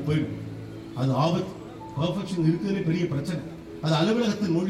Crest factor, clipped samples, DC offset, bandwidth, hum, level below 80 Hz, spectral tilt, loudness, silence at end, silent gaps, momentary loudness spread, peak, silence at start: 16 dB; under 0.1%; under 0.1%; 12.5 kHz; none; -56 dBFS; -7 dB/octave; -27 LUFS; 0 s; none; 14 LU; -10 dBFS; 0 s